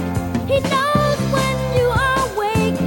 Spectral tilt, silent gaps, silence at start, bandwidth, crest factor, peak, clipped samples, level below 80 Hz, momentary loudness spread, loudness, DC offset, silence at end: -5.5 dB/octave; none; 0 s; 17 kHz; 14 dB; -4 dBFS; under 0.1%; -34 dBFS; 3 LU; -18 LUFS; under 0.1%; 0 s